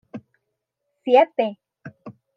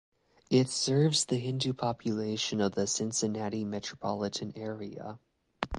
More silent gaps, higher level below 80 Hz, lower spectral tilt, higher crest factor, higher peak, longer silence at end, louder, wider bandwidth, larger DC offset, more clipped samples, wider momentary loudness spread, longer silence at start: neither; second, -80 dBFS vs -56 dBFS; first, -7 dB/octave vs -4.5 dB/octave; about the same, 20 dB vs 22 dB; first, -4 dBFS vs -10 dBFS; first, 0.25 s vs 0 s; first, -19 LUFS vs -31 LUFS; second, 6 kHz vs 11.5 kHz; neither; neither; first, 24 LU vs 13 LU; second, 0.15 s vs 0.5 s